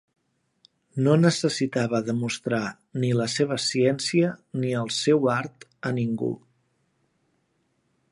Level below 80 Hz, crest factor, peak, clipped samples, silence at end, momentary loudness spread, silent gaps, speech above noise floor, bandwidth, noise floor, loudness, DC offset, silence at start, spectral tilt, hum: -68 dBFS; 20 dB; -6 dBFS; under 0.1%; 1.75 s; 9 LU; none; 47 dB; 11.5 kHz; -71 dBFS; -25 LUFS; under 0.1%; 0.95 s; -5.5 dB/octave; none